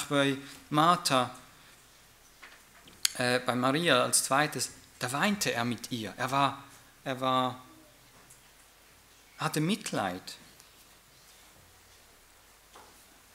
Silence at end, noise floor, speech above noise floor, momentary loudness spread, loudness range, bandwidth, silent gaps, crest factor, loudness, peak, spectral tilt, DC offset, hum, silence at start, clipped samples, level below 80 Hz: 0.5 s; -59 dBFS; 30 dB; 17 LU; 9 LU; 16 kHz; none; 28 dB; -29 LUFS; -4 dBFS; -3.5 dB/octave; under 0.1%; none; 0 s; under 0.1%; -68 dBFS